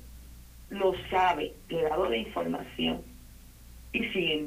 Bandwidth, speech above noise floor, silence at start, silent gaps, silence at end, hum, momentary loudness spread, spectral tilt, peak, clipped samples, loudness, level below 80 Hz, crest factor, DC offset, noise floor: 15.5 kHz; 21 dB; 0 s; none; 0 s; none; 15 LU; -5 dB/octave; -14 dBFS; under 0.1%; -30 LUFS; -50 dBFS; 18 dB; under 0.1%; -50 dBFS